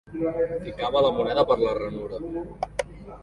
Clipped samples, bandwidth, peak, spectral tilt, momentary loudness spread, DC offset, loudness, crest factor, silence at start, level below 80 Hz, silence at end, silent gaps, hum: under 0.1%; 11.5 kHz; -8 dBFS; -6 dB/octave; 11 LU; under 0.1%; -26 LUFS; 18 dB; 0.05 s; -48 dBFS; 0 s; none; 50 Hz at -45 dBFS